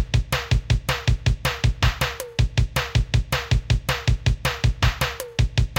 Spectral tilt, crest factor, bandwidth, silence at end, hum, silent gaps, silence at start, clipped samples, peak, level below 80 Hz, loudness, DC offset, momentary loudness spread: -4.5 dB/octave; 16 dB; 17 kHz; 0 s; none; none; 0 s; under 0.1%; -6 dBFS; -26 dBFS; -23 LUFS; under 0.1%; 3 LU